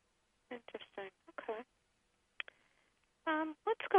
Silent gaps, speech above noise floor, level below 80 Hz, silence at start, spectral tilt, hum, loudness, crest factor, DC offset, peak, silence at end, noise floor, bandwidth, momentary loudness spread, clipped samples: none; 41 dB; -84 dBFS; 0.5 s; -5 dB/octave; none; -43 LUFS; 26 dB; under 0.1%; -16 dBFS; 0 s; -78 dBFS; 10.5 kHz; 13 LU; under 0.1%